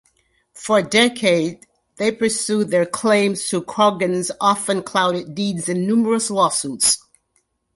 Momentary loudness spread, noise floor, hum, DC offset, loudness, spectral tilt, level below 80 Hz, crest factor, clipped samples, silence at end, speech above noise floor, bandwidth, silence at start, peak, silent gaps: 7 LU; -67 dBFS; none; under 0.1%; -18 LUFS; -3.5 dB/octave; -62 dBFS; 18 dB; under 0.1%; 0.8 s; 49 dB; 12 kHz; 0.55 s; -2 dBFS; none